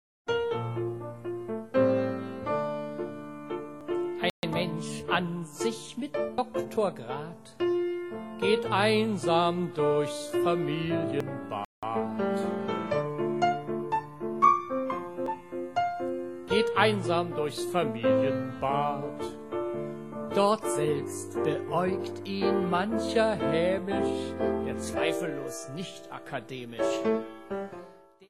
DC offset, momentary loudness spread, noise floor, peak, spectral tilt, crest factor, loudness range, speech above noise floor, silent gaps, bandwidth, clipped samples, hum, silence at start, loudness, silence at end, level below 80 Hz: 0.2%; 12 LU; -51 dBFS; -6 dBFS; -5.5 dB/octave; 22 dB; 5 LU; 22 dB; 4.30-4.42 s, 11.65-11.82 s; 13 kHz; under 0.1%; none; 0.25 s; -30 LUFS; 0.05 s; -64 dBFS